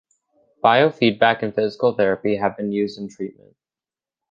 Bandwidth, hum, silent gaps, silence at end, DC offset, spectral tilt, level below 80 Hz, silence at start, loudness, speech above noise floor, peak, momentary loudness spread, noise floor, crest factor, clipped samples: 7.4 kHz; none; none; 1 s; under 0.1%; -6.5 dB/octave; -62 dBFS; 0.65 s; -19 LUFS; over 70 dB; -2 dBFS; 15 LU; under -90 dBFS; 20 dB; under 0.1%